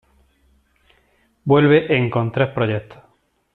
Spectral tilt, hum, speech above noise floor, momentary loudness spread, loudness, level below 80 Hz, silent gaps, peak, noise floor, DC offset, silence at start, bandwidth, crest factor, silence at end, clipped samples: -9.5 dB/octave; none; 44 dB; 11 LU; -18 LUFS; -54 dBFS; none; -2 dBFS; -61 dBFS; under 0.1%; 1.45 s; 4.3 kHz; 18 dB; 0.6 s; under 0.1%